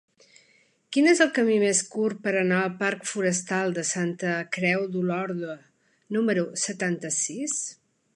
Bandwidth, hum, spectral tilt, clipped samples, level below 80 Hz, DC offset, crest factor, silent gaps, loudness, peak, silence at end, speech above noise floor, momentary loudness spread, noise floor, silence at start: 11.5 kHz; none; -4 dB/octave; under 0.1%; -74 dBFS; under 0.1%; 22 dB; none; -25 LUFS; -4 dBFS; 0.45 s; 38 dB; 9 LU; -63 dBFS; 0.9 s